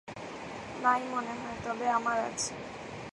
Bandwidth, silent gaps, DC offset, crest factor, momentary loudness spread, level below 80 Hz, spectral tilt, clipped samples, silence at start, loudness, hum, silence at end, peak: 11.5 kHz; none; under 0.1%; 22 dB; 13 LU; -62 dBFS; -3 dB/octave; under 0.1%; 0.05 s; -33 LUFS; none; 0 s; -12 dBFS